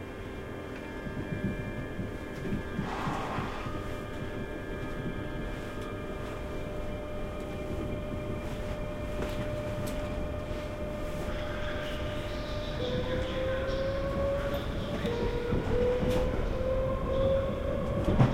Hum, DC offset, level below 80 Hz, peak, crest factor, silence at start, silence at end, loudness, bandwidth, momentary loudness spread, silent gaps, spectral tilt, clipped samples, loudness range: none; under 0.1%; -38 dBFS; -10 dBFS; 22 dB; 0 s; 0 s; -34 LUFS; 16 kHz; 8 LU; none; -7 dB/octave; under 0.1%; 7 LU